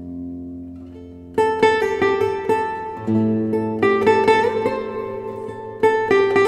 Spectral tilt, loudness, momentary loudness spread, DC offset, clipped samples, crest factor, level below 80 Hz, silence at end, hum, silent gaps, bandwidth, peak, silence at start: -6.5 dB/octave; -19 LUFS; 17 LU; under 0.1%; under 0.1%; 18 dB; -54 dBFS; 0 s; none; none; 11.5 kHz; -2 dBFS; 0 s